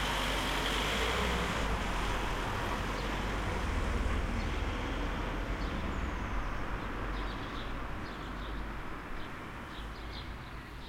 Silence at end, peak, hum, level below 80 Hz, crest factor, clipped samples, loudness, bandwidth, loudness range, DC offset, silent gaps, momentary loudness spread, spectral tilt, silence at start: 0 s; -20 dBFS; none; -38 dBFS; 16 dB; under 0.1%; -36 LUFS; 16.5 kHz; 8 LU; under 0.1%; none; 11 LU; -4.5 dB/octave; 0 s